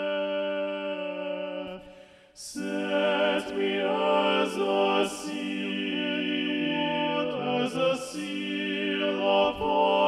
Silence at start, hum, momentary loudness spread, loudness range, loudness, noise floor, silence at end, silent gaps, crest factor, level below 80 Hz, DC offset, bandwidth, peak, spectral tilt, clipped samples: 0 s; none; 9 LU; 4 LU; -27 LUFS; -51 dBFS; 0 s; none; 16 dB; -64 dBFS; under 0.1%; 13.5 kHz; -12 dBFS; -4.5 dB/octave; under 0.1%